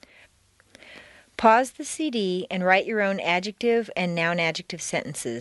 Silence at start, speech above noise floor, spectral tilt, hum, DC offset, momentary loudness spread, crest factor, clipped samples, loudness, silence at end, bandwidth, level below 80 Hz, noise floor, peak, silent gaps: 0.85 s; 37 dB; -4 dB/octave; none; under 0.1%; 10 LU; 22 dB; under 0.1%; -24 LUFS; 0 s; 11.5 kHz; -64 dBFS; -61 dBFS; -4 dBFS; none